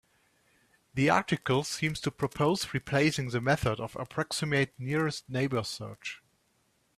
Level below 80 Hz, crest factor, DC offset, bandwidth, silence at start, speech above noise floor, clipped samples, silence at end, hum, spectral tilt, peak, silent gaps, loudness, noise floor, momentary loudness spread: -58 dBFS; 22 dB; under 0.1%; 14.5 kHz; 0.95 s; 42 dB; under 0.1%; 0.8 s; none; -5 dB/octave; -8 dBFS; none; -30 LUFS; -71 dBFS; 11 LU